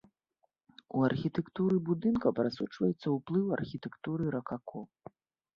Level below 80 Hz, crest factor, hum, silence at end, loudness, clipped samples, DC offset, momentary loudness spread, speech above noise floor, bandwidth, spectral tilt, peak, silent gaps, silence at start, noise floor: -66 dBFS; 20 dB; none; 0.75 s; -33 LUFS; under 0.1%; under 0.1%; 11 LU; 47 dB; 6.8 kHz; -9 dB/octave; -14 dBFS; none; 0.95 s; -79 dBFS